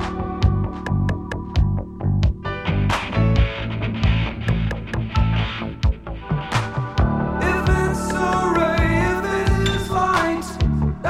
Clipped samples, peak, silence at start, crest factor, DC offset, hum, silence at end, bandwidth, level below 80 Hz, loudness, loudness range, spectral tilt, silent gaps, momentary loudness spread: under 0.1%; -4 dBFS; 0 s; 16 dB; under 0.1%; none; 0 s; 14 kHz; -26 dBFS; -21 LUFS; 3 LU; -6.5 dB/octave; none; 6 LU